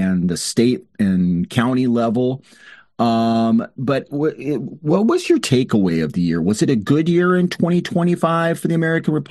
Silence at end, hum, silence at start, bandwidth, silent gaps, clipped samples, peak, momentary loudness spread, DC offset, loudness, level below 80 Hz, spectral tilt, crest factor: 0.05 s; none; 0 s; 12.5 kHz; none; under 0.1%; -2 dBFS; 5 LU; under 0.1%; -18 LUFS; -56 dBFS; -6.5 dB/octave; 16 dB